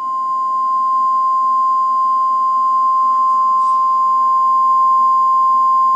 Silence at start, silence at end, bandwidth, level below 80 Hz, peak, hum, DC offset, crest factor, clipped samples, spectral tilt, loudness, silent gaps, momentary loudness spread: 0 s; 0 s; 9.6 kHz; -70 dBFS; -8 dBFS; none; under 0.1%; 6 dB; under 0.1%; -3 dB/octave; -14 LUFS; none; 3 LU